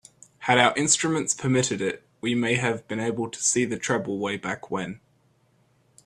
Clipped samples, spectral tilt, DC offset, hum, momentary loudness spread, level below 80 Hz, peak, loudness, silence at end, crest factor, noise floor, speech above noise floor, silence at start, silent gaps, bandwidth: under 0.1%; -3.5 dB/octave; under 0.1%; none; 12 LU; -64 dBFS; -2 dBFS; -24 LUFS; 1.1 s; 24 dB; -64 dBFS; 39 dB; 0.4 s; none; 13.5 kHz